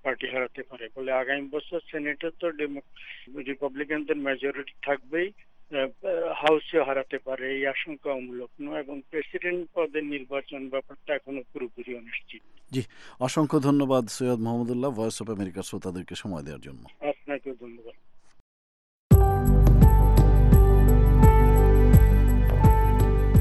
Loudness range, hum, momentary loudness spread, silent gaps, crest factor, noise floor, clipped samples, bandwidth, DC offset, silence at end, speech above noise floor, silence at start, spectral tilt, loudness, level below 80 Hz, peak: 14 LU; none; 18 LU; 18.40-19.10 s; 18 dB; under -90 dBFS; under 0.1%; 12.5 kHz; under 0.1%; 0 s; over 60 dB; 0.05 s; -7 dB/octave; -25 LUFS; -26 dBFS; -6 dBFS